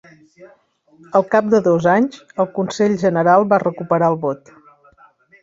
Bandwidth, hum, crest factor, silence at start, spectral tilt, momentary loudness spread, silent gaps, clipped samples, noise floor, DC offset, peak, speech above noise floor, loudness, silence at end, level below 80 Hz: 7.8 kHz; none; 16 dB; 0.4 s; -7 dB/octave; 9 LU; none; under 0.1%; -51 dBFS; under 0.1%; -2 dBFS; 34 dB; -17 LUFS; 1.05 s; -60 dBFS